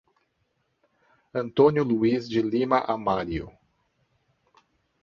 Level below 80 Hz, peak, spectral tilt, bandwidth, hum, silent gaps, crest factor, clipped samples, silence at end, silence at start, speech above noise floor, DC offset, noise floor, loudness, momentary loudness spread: -54 dBFS; -6 dBFS; -8 dB/octave; 7 kHz; none; none; 22 dB; under 0.1%; 1.55 s; 1.35 s; 50 dB; under 0.1%; -73 dBFS; -24 LUFS; 13 LU